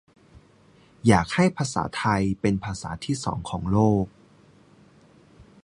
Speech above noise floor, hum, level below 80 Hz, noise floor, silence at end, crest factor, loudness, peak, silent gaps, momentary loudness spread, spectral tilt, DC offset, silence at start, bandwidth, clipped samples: 33 dB; none; -46 dBFS; -56 dBFS; 1.55 s; 22 dB; -24 LUFS; -4 dBFS; none; 10 LU; -6 dB/octave; under 0.1%; 0.35 s; 11 kHz; under 0.1%